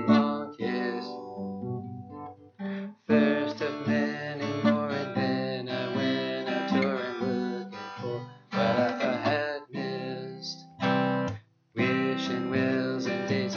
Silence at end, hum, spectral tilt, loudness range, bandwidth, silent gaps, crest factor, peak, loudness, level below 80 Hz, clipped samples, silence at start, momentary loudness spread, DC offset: 0 s; none; -6.5 dB/octave; 2 LU; 7 kHz; none; 20 dB; -10 dBFS; -29 LUFS; -72 dBFS; under 0.1%; 0 s; 12 LU; under 0.1%